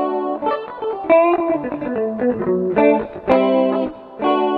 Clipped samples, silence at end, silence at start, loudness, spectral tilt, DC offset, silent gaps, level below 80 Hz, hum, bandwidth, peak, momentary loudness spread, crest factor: under 0.1%; 0 s; 0 s; -18 LUFS; -9 dB/octave; under 0.1%; none; -52 dBFS; none; 5 kHz; 0 dBFS; 9 LU; 18 dB